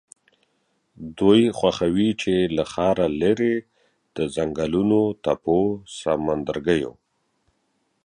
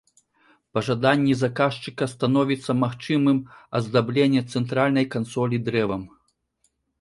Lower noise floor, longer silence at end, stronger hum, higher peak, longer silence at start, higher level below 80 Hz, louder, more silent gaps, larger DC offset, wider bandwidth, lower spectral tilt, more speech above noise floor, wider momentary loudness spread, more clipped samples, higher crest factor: about the same, -70 dBFS vs -70 dBFS; first, 1.15 s vs 0.95 s; neither; about the same, -4 dBFS vs -6 dBFS; first, 1 s vs 0.75 s; first, -50 dBFS vs -60 dBFS; about the same, -22 LUFS vs -23 LUFS; neither; neither; about the same, 10.5 kHz vs 11.5 kHz; about the same, -6.5 dB/octave vs -7 dB/octave; about the same, 49 dB vs 48 dB; first, 11 LU vs 8 LU; neither; about the same, 20 dB vs 18 dB